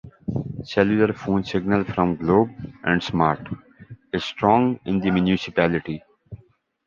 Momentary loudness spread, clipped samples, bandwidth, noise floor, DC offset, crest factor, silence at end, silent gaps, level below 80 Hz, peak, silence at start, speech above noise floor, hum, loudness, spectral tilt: 11 LU; under 0.1%; 7.2 kHz; -57 dBFS; under 0.1%; 20 dB; 0.5 s; none; -48 dBFS; -2 dBFS; 0.05 s; 36 dB; none; -22 LUFS; -7.5 dB/octave